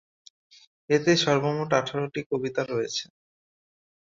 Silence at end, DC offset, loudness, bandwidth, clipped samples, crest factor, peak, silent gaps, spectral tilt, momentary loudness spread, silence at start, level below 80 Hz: 1 s; under 0.1%; -26 LUFS; 7.6 kHz; under 0.1%; 20 dB; -6 dBFS; 2.26-2.30 s; -4.5 dB/octave; 10 LU; 0.9 s; -66 dBFS